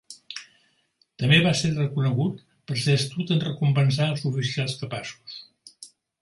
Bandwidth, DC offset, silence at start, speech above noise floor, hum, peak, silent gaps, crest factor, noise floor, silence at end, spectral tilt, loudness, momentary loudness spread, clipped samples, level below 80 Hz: 11.5 kHz; under 0.1%; 0.1 s; 44 dB; none; -4 dBFS; none; 20 dB; -67 dBFS; 0.35 s; -5.5 dB/octave; -24 LUFS; 21 LU; under 0.1%; -60 dBFS